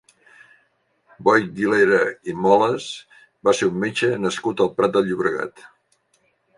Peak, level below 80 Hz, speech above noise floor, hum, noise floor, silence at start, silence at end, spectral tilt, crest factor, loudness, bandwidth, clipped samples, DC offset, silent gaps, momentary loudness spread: -2 dBFS; -62 dBFS; 46 dB; none; -65 dBFS; 1.2 s; 1.1 s; -5 dB/octave; 20 dB; -20 LUFS; 11.5 kHz; under 0.1%; under 0.1%; none; 10 LU